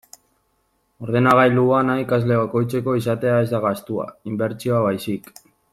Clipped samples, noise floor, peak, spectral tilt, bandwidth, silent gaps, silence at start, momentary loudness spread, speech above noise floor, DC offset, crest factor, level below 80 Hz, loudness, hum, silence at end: under 0.1%; -67 dBFS; -2 dBFS; -7.5 dB/octave; 15 kHz; none; 1 s; 13 LU; 48 dB; under 0.1%; 18 dB; -58 dBFS; -20 LUFS; none; 0.55 s